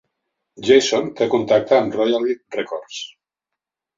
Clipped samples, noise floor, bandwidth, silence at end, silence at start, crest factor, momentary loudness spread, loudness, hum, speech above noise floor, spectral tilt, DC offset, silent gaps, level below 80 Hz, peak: under 0.1%; -84 dBFS; 7.6 kHz; 0.9 s; 0.6 s; 18 dB; 15 LU; -18 LUFS; none; 66 dB; -4 dB/octave; under 0.1%; none; -62 dBFS; -2 dBFS